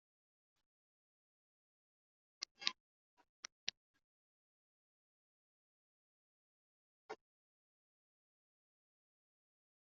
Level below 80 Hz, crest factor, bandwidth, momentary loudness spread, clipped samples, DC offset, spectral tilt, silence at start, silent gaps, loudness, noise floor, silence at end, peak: under -90 dBFS; 44 dB; 6.2 kHz; 15 LU; under 0.1%; under 0.1%; 3 dB/octave; 2.4 s; 2.51-2.55 s, 2.80-3.17 s, 3.29-3.43 s, 3.52-3.67 s, 3.77-3.94 s, 4.04-7.09 s; -47 LUFS; under -90 dBFS; 2.8 s; -14 dBFS